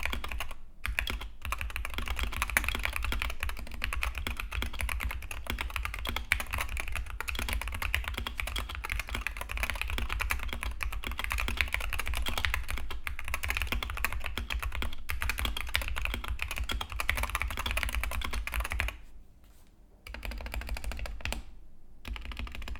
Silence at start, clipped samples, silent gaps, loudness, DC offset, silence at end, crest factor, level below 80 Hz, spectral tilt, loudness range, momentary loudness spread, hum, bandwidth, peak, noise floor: 0 s; under 0.1%; none; -35 LUFS; under 0.1%; 0 s; 30 dB; -36 dBFS; -3 dB/octave; 4 LU; 8 LU; none; 18.5 kHz; -4 dBFS; -55 dBFS